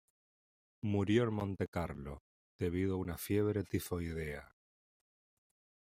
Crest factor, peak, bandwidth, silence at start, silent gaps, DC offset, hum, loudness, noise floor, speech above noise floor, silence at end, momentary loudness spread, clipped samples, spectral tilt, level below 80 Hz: 22 dB; -18 dBFS; 16 kHz; 0.85 s; 1.68-1.72 s, 2.20-2.59 s; under 0.1%; none; -37 LUFS; under -90 dBFS; over 54 dB; 1.5 s; 13 LU; under 0.1%; -7 dB/octave; -60 dBFS